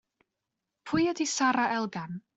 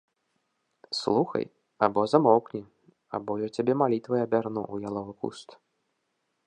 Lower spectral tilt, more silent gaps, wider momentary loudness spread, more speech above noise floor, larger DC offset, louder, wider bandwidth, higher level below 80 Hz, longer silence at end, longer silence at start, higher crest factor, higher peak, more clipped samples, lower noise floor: second, -3.5 dB/octave vs -6.5 dB/octave; neither; second, 9 LU vs 15 LU; first, 57 dB vs 51 dB; neither; about the same, -28 LUFS vs -27 LUFS; second, 8.2 kHz vs 10 kHz; about the same, -68 dBFS vs -70 dBFS; second, 0.2 s vs 0.95 s; about the same, 0.85 s vs 0.9 s; second, 16 dB vs 24 dB; second, -14 dBFS vs -4 dBFS; neither; first, -86 dBFS vs -78 dBFS